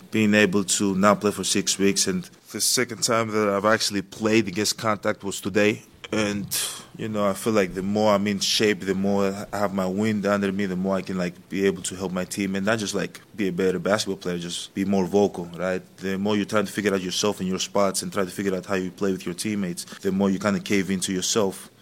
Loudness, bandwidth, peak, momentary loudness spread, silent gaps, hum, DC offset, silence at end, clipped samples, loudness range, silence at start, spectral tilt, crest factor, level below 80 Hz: -24 LUFS; 16.5 kHz; -2 dBFS; 9 LU; none; none; under 0.1%; 0.15 s; under 0.1%; 4 LU; 0 s; -4 dB/octave; 22 dB; -60 dBFS